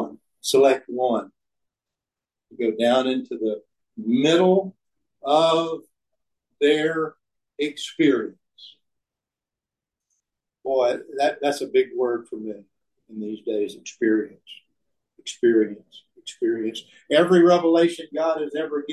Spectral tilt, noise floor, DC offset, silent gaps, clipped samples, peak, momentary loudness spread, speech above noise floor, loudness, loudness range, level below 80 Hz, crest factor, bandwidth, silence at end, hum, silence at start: -5 dB/octave; -89 dBFS; under 0.1%; none; under 0.1%; -6 dBFS; 18 LU; 67 dB; -22 LUFS; 7 LU; -74 dBFS; 18 dB; 12.5 kHz; 0 s; none; 0 s